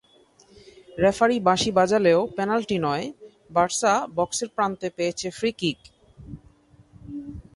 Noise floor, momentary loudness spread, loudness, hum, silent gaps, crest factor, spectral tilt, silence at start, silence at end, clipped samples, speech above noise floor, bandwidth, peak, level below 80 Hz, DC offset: -57 dBFS; 19 LU; -23 LUFS; none; none; 20 dB; -4 dB/octave; 0.9 s; 0.15 s; under 0.1%; 34 dB; 11.5 kHz; -6 dBFS; -54 dBFS; under 0.1%